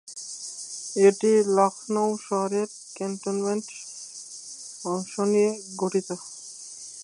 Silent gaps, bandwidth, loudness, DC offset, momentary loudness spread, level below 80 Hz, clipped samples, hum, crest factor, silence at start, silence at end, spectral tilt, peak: none; 11.5 kHz; -25 LUFS; under 0.1%; 18 LU; -80 dBFS; under 0.1%; none; 20 dB; 0.05 s; 0 s; -4.5 dB/octave; -6 dBFS